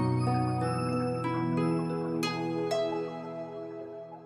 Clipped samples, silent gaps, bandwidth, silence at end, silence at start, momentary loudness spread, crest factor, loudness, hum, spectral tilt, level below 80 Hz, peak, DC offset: under 0.1%; none; 14.5 kHz; 0 s; 0 s; 11 LU; 14 dB; -31 LUFS; none; -7 dB/octave; -66 dBFS; -16 dBFS; under 0.1%